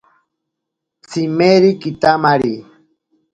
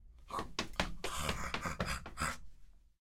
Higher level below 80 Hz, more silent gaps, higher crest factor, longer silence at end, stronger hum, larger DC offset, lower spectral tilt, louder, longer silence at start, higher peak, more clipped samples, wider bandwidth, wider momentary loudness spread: about the same, -54 dBFS vs -50 dBFS; neither; second, 16 dB vs 26 dB; first, 0.7 s vs 0.25 s; neither; neither; first, -6.5 dB/octave vs -3.5 dB/octave; first, -14 LUFS vs -40 LUFS; first, 1.1 s vs 0 s; first, 0 dBFS vs -14 dBFS; neither; second, 9 kHz vs 16.5 kHz; first, 12 LU vs 5 LU